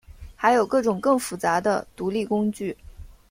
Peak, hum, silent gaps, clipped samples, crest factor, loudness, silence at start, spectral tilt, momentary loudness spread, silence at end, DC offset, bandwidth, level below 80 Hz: -6 dBFS; none; none; under 0.1%; 18 dB; -23 LUFS; 0.1 s; -5 dB/octave; 10 LU; 0.25 s; under 0.1%; 16.5 kHz; -50 dBFS